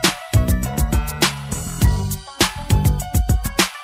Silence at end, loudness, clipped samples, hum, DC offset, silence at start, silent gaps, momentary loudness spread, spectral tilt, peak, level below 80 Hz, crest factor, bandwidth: 0 s; -20 LUFS; under 0.1%; none; under 0.1%; 0 s; none; 5 LU; -4 dB/octave; 0 dBFS; -24 dBFS; 18 dB; 16 kHz